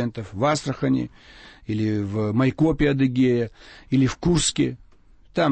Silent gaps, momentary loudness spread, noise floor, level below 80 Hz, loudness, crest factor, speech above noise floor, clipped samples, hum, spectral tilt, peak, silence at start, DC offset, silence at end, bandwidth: none; 11 LU; -51 dBFS; -42 dBFS; -23 LUFS; 14 dB; 29 dB; under 0.1%; none; -5.5 dB/octave; -8 dBFS; 0 s; under 0.1%; 0 s; 8.8 kHz